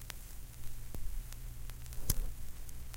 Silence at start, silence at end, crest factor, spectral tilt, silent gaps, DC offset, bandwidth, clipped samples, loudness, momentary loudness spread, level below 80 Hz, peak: 0 s; 0 s; 24 dB; -3.5 dB/octave; none; under 0.1%; 17 kHz; under 0.1%; -45 LUFS; 12 LU; -42 dBFS; -14 dBFS